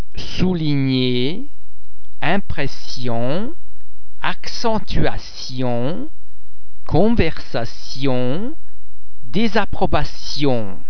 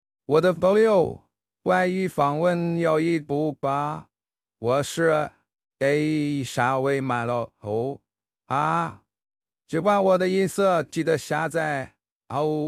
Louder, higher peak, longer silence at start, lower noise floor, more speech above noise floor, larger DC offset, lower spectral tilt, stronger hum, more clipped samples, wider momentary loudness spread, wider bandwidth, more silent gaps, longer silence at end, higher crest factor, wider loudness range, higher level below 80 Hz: about the same, -22 LUFS vs -24 LUFS; first, 0 dBFS vs -6 dBFS; second, 0 s vs 0.3 s; second, -46 dBFS vs under -90 dBFS; second, 31 dB vs over 67 dB; first, 30% vs under 0.1%; about the same, -6 dB/octave vs -6 dB/octave; neither; neither; about the same, 11 LU vs 11 LU; second, 5.4 kHz vs 14.5 kHz; second, none vs 12.12-12.20 s; about the same, 0 s vs 0 s; about the same, 18 dB vs 18 dB; about the same, 3 LU vs 4 LU; first, -32 dBFS vs -62 dBFS